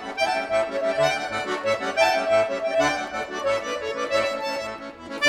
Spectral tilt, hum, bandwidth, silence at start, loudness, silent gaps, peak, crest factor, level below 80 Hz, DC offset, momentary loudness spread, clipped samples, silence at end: -3 dB/octave; none; 15 kHz; 0 s; -24 LUFS; none; -6 dBFS; 18 dB; -56 dBFS; under 0.1%; 8 LU; under 0.1%; 0 s